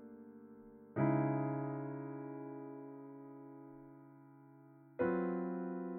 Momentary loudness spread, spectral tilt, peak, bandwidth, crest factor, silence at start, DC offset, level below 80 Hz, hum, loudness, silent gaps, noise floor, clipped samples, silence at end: 24 LU; -12 dB/octave; -22 dBFS; 3.2 kHz; 20 dB; 0 s; under 0.1%; -76 dBFS; none; -39 LUFS; none; -61 dBFS; under 0.1%; 0 s